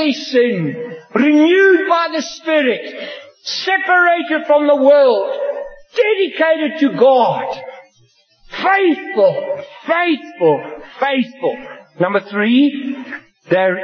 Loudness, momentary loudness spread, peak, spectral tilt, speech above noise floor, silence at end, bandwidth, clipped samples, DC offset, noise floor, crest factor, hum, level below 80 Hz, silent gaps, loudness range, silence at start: -15 LUFS; 17 LU; 0 dBFS; -5.5 dB/octave; 40 dB; 0 s; 6.6 kHz; under 0.1%; under 0.1%; -54 dBFS; 14 dB; none; -64 dBFS; none; 4 LU; 0 s